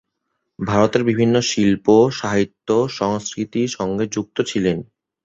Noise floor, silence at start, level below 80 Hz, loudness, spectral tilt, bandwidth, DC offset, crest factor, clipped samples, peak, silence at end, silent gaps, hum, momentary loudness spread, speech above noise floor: -75 dBFS; 0.6 s; -50 dBFS; -19 LUFS; -5.5 dB/octave; 8 kHz; under 0.1%; 18 dB; under 0.1%; -2 dBFS; 0.4 s; none; none; 8 LU; 57 dB